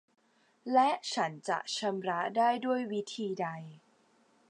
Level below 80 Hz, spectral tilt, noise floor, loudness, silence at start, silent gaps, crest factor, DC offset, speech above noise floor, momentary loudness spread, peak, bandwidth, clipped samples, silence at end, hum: -90 dBFS; -4 dB/octave; -68 dBFS; -32 LUFS; 0.65 s; none; 18 dB; under 0.1%; 36 dB; 10 LU; -14 dBFS; 11 kHz; under 0.1%; 0.7 s; none